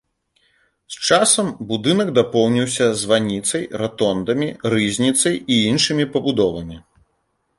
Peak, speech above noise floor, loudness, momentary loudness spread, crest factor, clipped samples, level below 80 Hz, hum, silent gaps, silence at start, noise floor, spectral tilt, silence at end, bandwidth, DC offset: -2 dBFS; 51 dB; -18 LUFS; 8 LU; 18 dB; under 0.1%; -52 dBFS; none; none; 0.9 s; -69 dBFS; -3.5 dB/octave; 0.8 s; 11.5 kHz; under 0.1%